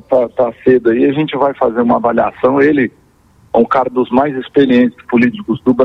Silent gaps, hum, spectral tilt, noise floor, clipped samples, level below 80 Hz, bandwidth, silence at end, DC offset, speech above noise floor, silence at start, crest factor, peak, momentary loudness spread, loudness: none; none; -8.5 dB/octave; -48 dBFS; under 0.1%; -48 dBFS; 5.4 kHz; 0 s; under 0.1%; 36 dB; 0.1 s; 12 dB; 0 dBFS; 4 LU; -13 LUFS